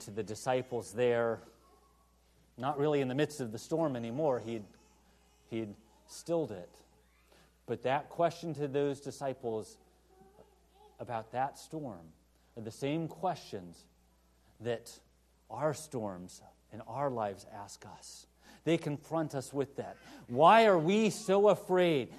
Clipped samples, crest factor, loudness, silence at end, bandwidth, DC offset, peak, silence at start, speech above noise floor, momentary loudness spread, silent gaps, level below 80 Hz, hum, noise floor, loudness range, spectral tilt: under 0.1%; 24 dB; -33 LUFS; 0 s; 13 kHz; under 0.1%; -10 dBFS; 0 s; 35 dB; 21 LU; none; -70 dBFS; none; -68 dBFS; 12 LU; -5.5 dB/octave